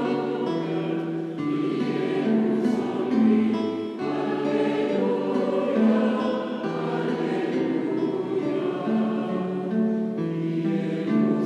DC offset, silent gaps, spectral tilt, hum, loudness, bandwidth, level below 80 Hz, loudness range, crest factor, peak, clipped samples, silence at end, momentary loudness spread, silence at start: under 0.1%; none; -8 dB/octave; none; -25 LUFS; 8.6 kHz; -76 dBFS; 2 LU; 14 dB; -10 dBFS; under 0.1%; 0 s; 6 LU; 0 s